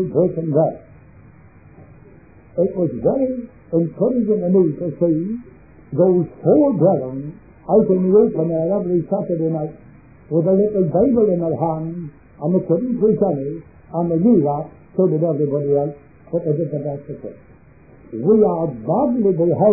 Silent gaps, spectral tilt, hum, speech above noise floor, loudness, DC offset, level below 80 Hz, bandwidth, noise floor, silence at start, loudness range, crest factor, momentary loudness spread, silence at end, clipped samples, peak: none; -17 dB/octave; none; 29 dB; -18 LUFS; 0.2%; -52 dBFS; 2.6 kHz; -47 dBFS; 0 s; 5 LU; 16 dB; 14 LU; 0 s; under 0.1%; -2 dBFS